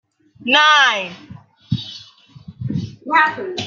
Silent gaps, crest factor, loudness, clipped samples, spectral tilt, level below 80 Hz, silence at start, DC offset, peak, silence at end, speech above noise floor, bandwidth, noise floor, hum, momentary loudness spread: none; 18 dB; -16 LUFS; under 0.1%; -3.5 dB/octave; -54 dBFS; 0.4 s; under 0.1%; -2 dBFS; 0 s; 28 dB; 7.6 kHz; -44 dBFS; none; 20 LU